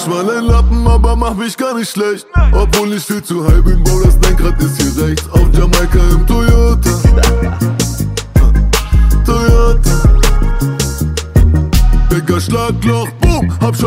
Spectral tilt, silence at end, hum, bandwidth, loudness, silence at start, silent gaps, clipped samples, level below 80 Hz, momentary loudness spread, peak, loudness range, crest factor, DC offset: -5.5 dB/octave; 0 s; none; 16.5 kHz; -12 LUFS; 0 s; none; under 0.1%; -12 dBFS; 5 LU; 0 dBFS; 2 LU; 10 dB; under 0.1%